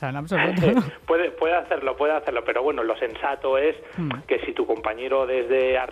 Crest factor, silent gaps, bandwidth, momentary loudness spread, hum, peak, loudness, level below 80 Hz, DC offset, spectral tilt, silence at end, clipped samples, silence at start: 16 dB; none; 11.5 kHz; 6 LU; none; -6 dBFS; -23 LUFS; -52 dBFS; under 0.1%; -7 dB/octave; 0 s; under 0.1%; 0 s